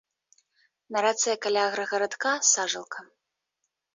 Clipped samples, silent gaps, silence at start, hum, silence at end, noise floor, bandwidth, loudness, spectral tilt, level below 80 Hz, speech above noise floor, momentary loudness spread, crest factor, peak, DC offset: under 0.1%; none; 0.9 s; none; 0.9 s; -82 dBFS; 7.8 kHz; -25 LUFS; 0 dB/octave; -80 dBFS; 55 dB; 12 LU; 20 dB; -8 dBFS; under 0.1%